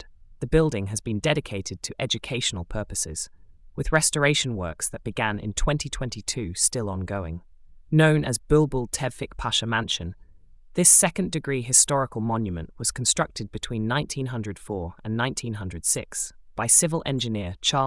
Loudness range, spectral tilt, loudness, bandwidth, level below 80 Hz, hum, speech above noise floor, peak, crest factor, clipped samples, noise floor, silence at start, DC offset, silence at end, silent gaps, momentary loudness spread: 7 LU; -3.5 dB/octave; -24 LUFS; 12 kHz; -40 dBFS; none; 24 dB; -4 dBFS; 22 dB; under 0.1%; -49 dBFS; 0 s; under 0.1%; 0 s; none; 15 LU